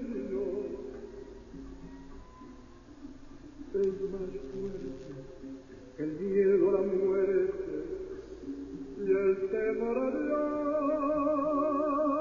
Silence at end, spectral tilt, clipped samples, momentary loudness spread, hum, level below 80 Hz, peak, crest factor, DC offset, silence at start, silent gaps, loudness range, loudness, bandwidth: 0 s; -8.5 dB/octave; under 0.1%; 21 LU; none; -54 dBFS; -16 dBFS; 16 dB; under 0.1%; 0 s; none; 10 LU; -31 LUFS; 7.2 kHz